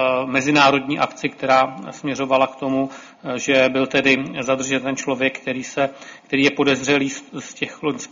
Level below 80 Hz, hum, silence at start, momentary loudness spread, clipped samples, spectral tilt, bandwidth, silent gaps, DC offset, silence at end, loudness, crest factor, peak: -60 dBFS; none; 0 s; 11 LU; under 0.1%; -4 dB/octave; 7.6 kHz; none; under 0.1%; 0.05 s; -19 LUFS; 18 dB; -2 dBFS